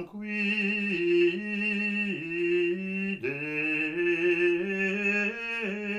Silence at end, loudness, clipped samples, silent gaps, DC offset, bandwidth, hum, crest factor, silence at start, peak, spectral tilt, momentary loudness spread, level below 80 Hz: 0 s; -27 LUFS; under 0.1%; none; under 0.1%; 9 kHz; none; 14 dB; 0 s; -14 dBFS; -6 dB/octave; 6 LU; -68 dBFS